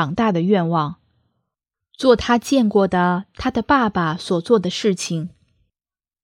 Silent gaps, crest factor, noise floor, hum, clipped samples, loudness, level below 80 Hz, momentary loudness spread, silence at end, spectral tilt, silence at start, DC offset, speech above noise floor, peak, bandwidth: none; 18 dB; under -90 dBFS; none; under 0.1%; -19 LUFS; -48 dBFS; 7 LU; 0.95 s; -5.5 dB/octave; 0 s; under 0.1%; over 72 dB; -2 dBFS; 15 kHz